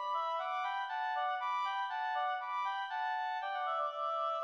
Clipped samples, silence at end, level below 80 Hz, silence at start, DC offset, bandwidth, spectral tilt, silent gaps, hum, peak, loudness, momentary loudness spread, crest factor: under 0.1%; 0 s; under -90 dBFS; 0 s; under 0.1%; 7.4 kHz; 2.5 dB/octave; none; none; -26 dBFS; -36 LUFS; 2 LU; 12 dB